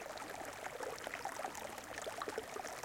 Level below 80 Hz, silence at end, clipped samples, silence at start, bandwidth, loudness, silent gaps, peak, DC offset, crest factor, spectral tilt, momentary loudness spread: -72 dBFS; 0 s; under 0.1%; 0 s; 17 kHz; -45 LUFS; none; -28 dBFS; under 0.1%; 18 dB; -2 dB/octave; 3 LU